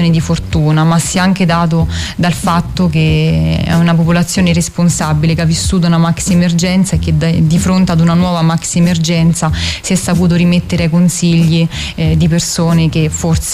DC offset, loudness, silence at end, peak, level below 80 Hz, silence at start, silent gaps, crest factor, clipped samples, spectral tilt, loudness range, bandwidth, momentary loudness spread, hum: under 0.1%; -11 LUFS; 0 s; -2 dBFS; -28 dBFS; 0 s; none; 8 dB; under 0.1%; -5.5 dB/octave; 1 LU; 15 kHz; 4 LU; none